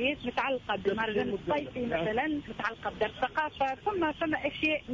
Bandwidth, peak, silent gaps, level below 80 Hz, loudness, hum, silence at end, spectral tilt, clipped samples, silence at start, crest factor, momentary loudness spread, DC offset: 7.6 kHz; -18 dBFS; none; -56 dBFS; -31 LUFS; none; 0 s; -6 dB/octave; under 0.1%; 0 s; 14 dB; 4 LU; under 0.1%